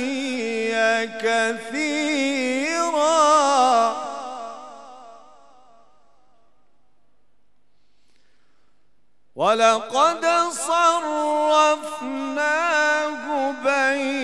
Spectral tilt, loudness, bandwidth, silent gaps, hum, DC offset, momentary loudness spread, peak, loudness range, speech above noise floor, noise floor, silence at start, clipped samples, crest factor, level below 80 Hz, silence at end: -1.5 dB/octave; -20 LUFS; 13.5 kHz; none; none; 0.3%; 11 LU; -4 dBFS; 7 LU; 50 dB; -70 dBFS; 0 s; under 0.1%; 18 dB; -76 dBFS; 0 s